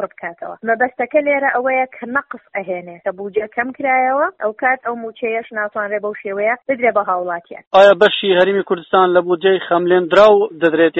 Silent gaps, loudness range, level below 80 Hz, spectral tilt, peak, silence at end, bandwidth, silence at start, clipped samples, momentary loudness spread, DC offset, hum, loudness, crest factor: 7.67-7.71 s; 7 LU; -60 dBFS; -2 dB/octave; 0 dBFS; 0 s; 7.4 kHz; 0 s; under 0.1%; 15 LU; under 0.1%; none; -16 LUFS; 16 dB